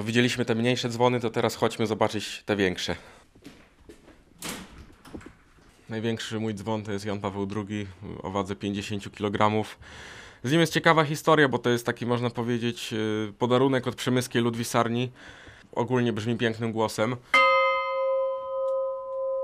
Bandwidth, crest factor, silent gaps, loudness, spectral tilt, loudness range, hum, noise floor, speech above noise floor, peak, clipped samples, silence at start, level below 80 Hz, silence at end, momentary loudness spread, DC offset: 15 kHz; 24 dB; none; -26 LUFS; -5 dB/octave; 9 LU; none; -56 dBFS; 30 dB; -4 dBFS; under 0.1%; 0 s; -60 dBFS; 0 s; 16 LU; under 0.1%